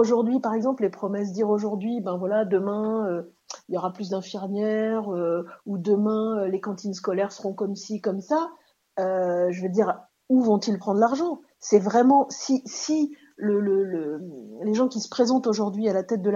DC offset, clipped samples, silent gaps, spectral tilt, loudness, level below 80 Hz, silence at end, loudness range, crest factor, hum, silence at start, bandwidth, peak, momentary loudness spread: under 0.1%; under 0.1%; none; -6 dB/octave; -25 LUFS; -78 dBFS; 0 s; 5 LU; 20 dB; none; 0 s; 7.6 kHz; -4 dBFS; 9 LU